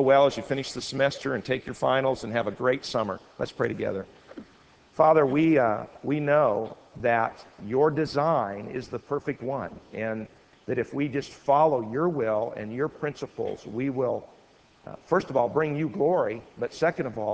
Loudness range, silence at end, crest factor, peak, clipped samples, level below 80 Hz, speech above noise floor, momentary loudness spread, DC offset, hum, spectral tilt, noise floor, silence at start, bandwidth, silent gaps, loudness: 6 LU; 0 s; 20 dB; -8 dBFS; under 0.1%; -60 dBFS; 32 dB; 13 LU; under 0.1%; none; -6.5 dB/octave; -58 dBFS; 0 s; 8 kHz; none; -27 LUFS